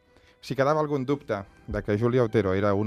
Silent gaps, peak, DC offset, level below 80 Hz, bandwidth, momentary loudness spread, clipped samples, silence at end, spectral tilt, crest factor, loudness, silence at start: none; -8 dBFS; under 0.1%; -50 dBFS; 14 kHz; 11 LU; under 0.1%; 0 s; -8 dB/octave; 18 dB; -26 LUFS; 0.45 s